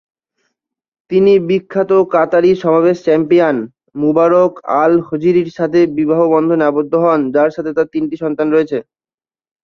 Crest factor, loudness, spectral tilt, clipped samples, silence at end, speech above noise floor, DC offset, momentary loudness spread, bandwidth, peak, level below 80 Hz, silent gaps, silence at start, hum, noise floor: 12 dB; -13 LUFS; -8 dB/octave; under 0.1%; 0.8 s; over 78 dB; under 0.1%; 7 LU; 6.8 kHz; -2 dBFS; -56 dBFS; none; 1.1 s; none; under -90 dBFS